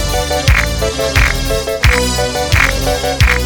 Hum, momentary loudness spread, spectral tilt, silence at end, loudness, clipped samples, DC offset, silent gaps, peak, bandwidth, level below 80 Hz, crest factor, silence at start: none; 4 LU; -3.5 dB/octave; 0 s; -13 LUFS; under 0.1%; under 0.1%; none; 0 dBFS; 19 kHz; -18 dBFS; 12 dB; 0 s